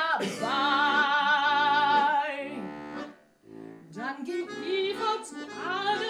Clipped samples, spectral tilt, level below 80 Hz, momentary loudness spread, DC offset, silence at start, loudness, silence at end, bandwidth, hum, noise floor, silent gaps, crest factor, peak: under 0.1%; -3 dB/octave; -72 dBFS; 17 LU; under 0.1%; 0 s; -26 LUFS; 0 s; 13 kHz; none; -50 dBFS; none; 16 dB; -12 dBFS